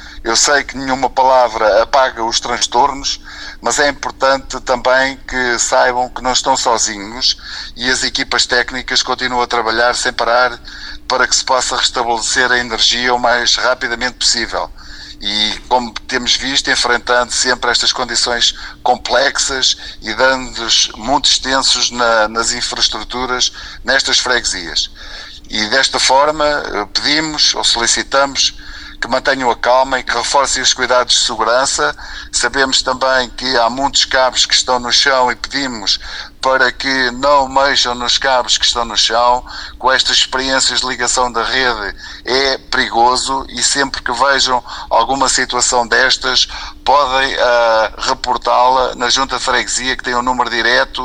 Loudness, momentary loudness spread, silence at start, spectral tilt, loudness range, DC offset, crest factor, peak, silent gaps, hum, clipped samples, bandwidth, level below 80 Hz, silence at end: -13 LUFS; 7 LU; 0 s; -0.5 dB/octave; 2 LU; under 0.1%; 14 dB; 0 dBFS; none; none; under 0.1%; 13.5 kHz; -36 dBFS; 0 s